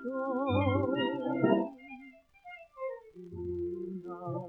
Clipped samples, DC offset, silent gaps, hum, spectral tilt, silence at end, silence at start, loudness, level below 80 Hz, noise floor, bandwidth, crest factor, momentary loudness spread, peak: under 0.1%; under 0.1%; none; none; -9.5 dB/octave; 0 s; 0 s; -33 LUFS; -64 dBFS; -55 dBFS; 4 kHz; 20 dB; 20 LU; -14 dBFS